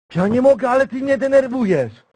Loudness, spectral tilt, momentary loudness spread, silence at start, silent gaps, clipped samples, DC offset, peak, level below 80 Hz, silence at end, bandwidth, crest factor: -17 LUFS; -7.5 dB/octave; 5 LU; 0.1 s; none; under 0.1%; under 0.1%; -2 dBFS; -54 dBFS; 0.25 s; 10 kHz; 14 dB